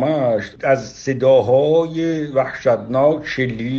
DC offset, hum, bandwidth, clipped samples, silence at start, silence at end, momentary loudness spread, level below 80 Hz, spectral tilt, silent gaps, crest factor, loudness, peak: under 0.1%; none; 7.2 kHz; under 0.1%; 0 s; 0 s; 7 LU; -52 dBFS; -6.5 dB/octave; none; 14 dB; -17 LUFS; -2 dBFS